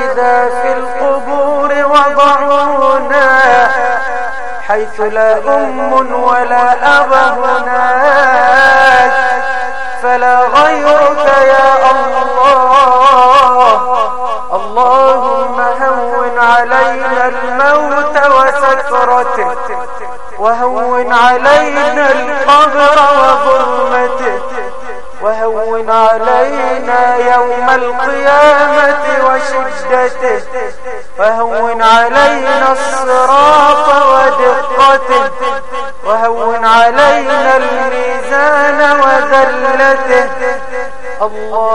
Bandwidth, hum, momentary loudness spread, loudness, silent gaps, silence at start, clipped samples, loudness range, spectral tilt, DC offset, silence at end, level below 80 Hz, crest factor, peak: 11.5 kHz; none; 10 LU; -9 LUFS; none; 0 s; 0.3%; 4 LU; -3 dB/octave; 10%; 0 s; -42 dBFS; 10 dB; 0 dBFS